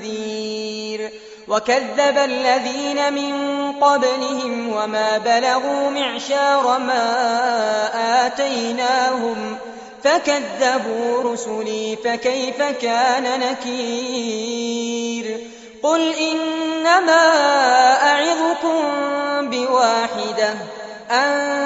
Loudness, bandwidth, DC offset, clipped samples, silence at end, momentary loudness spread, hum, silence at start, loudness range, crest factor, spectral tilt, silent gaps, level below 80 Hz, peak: -18 LUFS; 8 kHz; under 0.1%; under 0.1%; 0 s; 11 LU; none; 0 s; 5 LU; 16 dB; -0.5 dB/octave; none; -66 dBFS; -2 dBFS